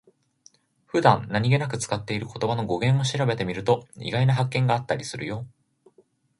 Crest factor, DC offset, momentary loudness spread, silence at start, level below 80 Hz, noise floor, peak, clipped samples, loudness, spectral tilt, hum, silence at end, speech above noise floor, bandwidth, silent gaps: 22 dB; under 0.1%; 10 LU; 0.95 s; -56 dBFS; -62 dBFS; -2 dBFS; under 0.1%; -24 LUFS; -6 dB/octave; none; 0.9 s; 38 dB; 11.5 kHz; none